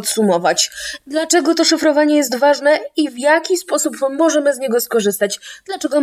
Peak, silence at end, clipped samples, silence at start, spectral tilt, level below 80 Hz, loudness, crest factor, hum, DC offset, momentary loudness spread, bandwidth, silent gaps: 0 dBFS; 0 s; under 0.1%; 0 s; -2.5 dB/octave; -62 dBFS; -15 LUFS; 16 dB; none; under 0.1%; 8 LU; 16 kHz; none